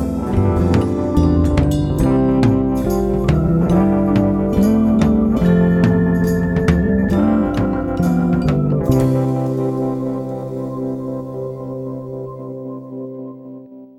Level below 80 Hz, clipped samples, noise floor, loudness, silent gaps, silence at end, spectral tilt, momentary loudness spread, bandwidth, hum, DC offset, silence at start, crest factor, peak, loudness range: -28 dBFS; under 0.1%; -36 dBFS; -16 LUFS; none; 0.15 s; -8.5 dB/octave; 15 LU; 13.5 kHz; none; under 0.1%; 0 s; 16 dB; 0 dBFS; 10 LU